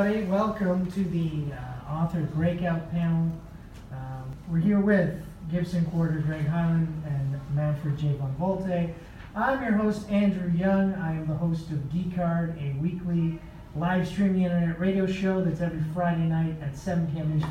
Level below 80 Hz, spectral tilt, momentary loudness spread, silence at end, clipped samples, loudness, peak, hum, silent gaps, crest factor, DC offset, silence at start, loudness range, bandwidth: -48 dBFS; -8.5 dB/octave; 9 LU; 0 s; under 0.1%; -27 LUFS; -10 dBFS; none; none; 16 dB; under 0.1%; 0 s; 2 LU; 9.2 kHz